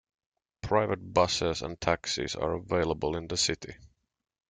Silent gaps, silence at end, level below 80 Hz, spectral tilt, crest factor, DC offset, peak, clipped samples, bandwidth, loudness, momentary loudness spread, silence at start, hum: none; 0.65 s; -52 dBFS; -3.5 dB/octave; 22 dB; under 0.1%; -8 dBFS; under 0.1%; 9.6 kHz; -29 LUFS; 6 LU; 0.65 s; none